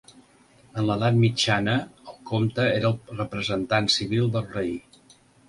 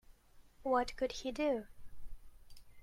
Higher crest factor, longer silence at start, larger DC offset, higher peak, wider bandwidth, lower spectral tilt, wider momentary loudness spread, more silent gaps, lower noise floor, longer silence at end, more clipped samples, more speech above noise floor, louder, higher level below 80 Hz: about the same, 18 dB vs 20 dB; first, 0.75 s vs 0.35 s; neither; first, -6 dBFS vs -20 dBFS; second, 11.5 kHz vs 16 kHz; first, -5.5 dB/octave vs -4 dB/octave; about the same, 11 LU vs 9 LU; neither; second, -56 dBFS vs -61 dBFS; first, 0.7 s vs 0 s; neither; first, 33 dB vs 25 dB; first, -24 LUFS vs -37 LUFS; about the same, -54 dBFS vs -56 dBFS